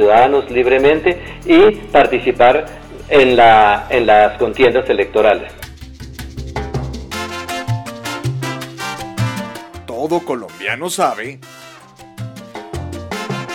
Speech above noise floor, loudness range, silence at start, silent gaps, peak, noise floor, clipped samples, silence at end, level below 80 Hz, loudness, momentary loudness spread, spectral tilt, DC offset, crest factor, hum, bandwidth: 27 dB; 12 LU; 0 s; none; -2 dBFS; -40 dBFS; under 0.1%; 0 s; -38 dBFS; -14 LUFS; 21 LU; -5.5 dB/octave; under 0.1%; 12 dB; none; 17 kHz